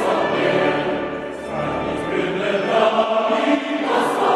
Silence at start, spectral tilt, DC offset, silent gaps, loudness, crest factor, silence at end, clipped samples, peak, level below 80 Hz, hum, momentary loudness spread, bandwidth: 0 s; -5.5 dB/octave; under 0.1%; none; -20 LUFS; 16 dB; 0 s; under 0.1%; -4 dBFS; -50 dBFS; none; 8 LU; 13 kHz